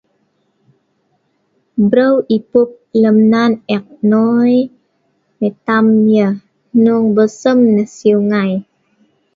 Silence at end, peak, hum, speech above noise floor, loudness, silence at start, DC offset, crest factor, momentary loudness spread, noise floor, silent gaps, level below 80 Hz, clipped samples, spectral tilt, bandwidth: 0.75 s; 0 dBFS; none; 51 dB; -13 LUFS; 1.75 s; under 0.1%; 14 dB; 9 LU; -62 dBFS; none; -60 dBFS; under 0.1%; -7.5 dB/octave; 7.4 kHz